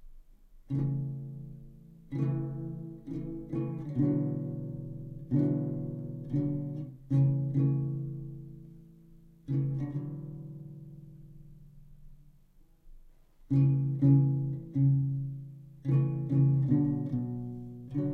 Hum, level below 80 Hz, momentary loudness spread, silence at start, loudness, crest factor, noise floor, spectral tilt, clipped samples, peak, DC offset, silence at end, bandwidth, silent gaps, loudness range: none; -56 dBFS; 19 LU; 0 s; -31 LUFS; 18 dB; -60 dBFS; -12 dB/octave; under 0.1%; -14 dBFS; under 0.1%; 0 s; 2.6 kHz; none; 11 LU